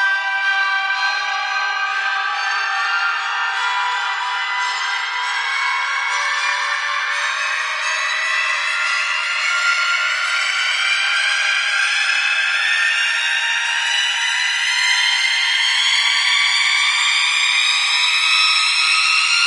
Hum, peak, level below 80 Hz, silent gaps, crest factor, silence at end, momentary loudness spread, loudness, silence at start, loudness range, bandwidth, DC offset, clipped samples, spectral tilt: none; -2 dBFS; under -90 dBFS; none; 16 dB; 0 s; 6 LU; -16 LUFS; 0 s; 5 LU; 11.5 kHz; under 0.1%; under 0.1%; 9 dB/octave